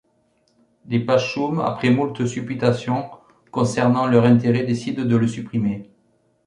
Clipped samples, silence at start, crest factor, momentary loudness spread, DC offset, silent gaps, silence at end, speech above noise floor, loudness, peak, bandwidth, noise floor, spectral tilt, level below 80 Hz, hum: under 0.1%; 0.85 s; 18 dB; 9 LU; under 0.1%; none; 0.65 s; 44 dB; -20 LUFS; -2 dBFS; 10.5 kHz; -64 dBFS; -7 dB/octave; -56 dBFS; none